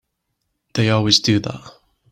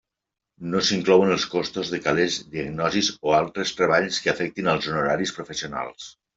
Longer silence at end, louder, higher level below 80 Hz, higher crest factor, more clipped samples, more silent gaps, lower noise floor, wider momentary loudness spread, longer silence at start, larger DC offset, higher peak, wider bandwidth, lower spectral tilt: first, 0.4 s vs 0.25 s; first, -17 LUFS vs -23 LUFS; about the same, -52 dBFS vs -56 dBFS; about the same, 20 dB vs 20 dB; neither; neither; second, -74 dBFS vs -86 dBFS; first, 16 LU vs 13 LU; first, 0.75 s vs 0.6 s; neither; first, 0 dBFS vs -4 dBFS; first, 14.5 kHz vs 8 kHz; about the same, -4.5 dB/octave vs -4 dB/octave